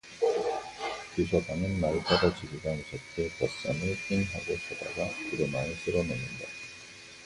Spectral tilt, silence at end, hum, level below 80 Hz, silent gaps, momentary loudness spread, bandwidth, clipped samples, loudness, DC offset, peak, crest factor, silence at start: -5.5 dB/octave; 0 s; none; -50 dBFS; none; 11 LU; 11.5 kHz; under 0.1%; -31 LUFS; under 0.1%; -12 dBFS; 20 dB; 0.05 s